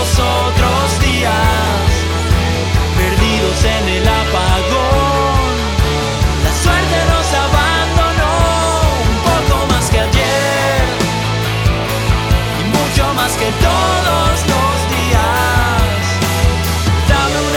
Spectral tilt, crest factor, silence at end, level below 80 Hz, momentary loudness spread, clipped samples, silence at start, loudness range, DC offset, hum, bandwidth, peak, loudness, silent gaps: -4.5 dB/octave; 12 dB; 0 s; -18 dBFS; 3 LU; under 0.1%; 0 s; 1 LU; under 0.1%; none; 18 kHz; 0 dBFS; -13 LUFS; none